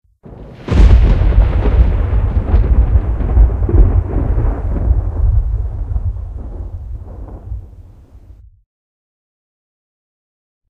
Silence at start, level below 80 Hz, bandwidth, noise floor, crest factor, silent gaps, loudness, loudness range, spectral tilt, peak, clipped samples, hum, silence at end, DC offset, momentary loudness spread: 0.25 s; -14 dBFS; 4.5 kHz; -40 dBFS; 14 dB; none; -15 LUFS; 20 LU; -9 dB/octave; 0 dBFS; under 0.1%; none; 2.35 s; under 0.1%; 18 LU